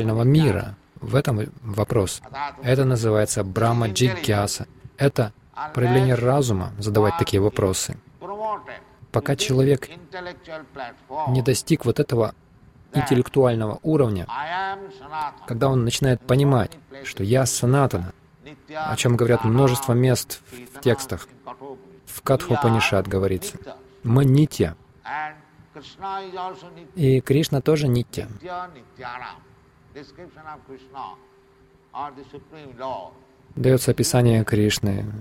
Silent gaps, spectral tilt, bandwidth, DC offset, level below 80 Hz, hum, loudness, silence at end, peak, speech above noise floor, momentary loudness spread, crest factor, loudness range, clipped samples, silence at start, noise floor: none; -6 dB/octave; 16 kHz; under 0.1%; -48 dBFS; none; -22 LUFS; 0 s; -6 dBFS; 33 dB; 19 LU; 16 dB; 6 LU; under 0.1%; 0 s; -55 dBFS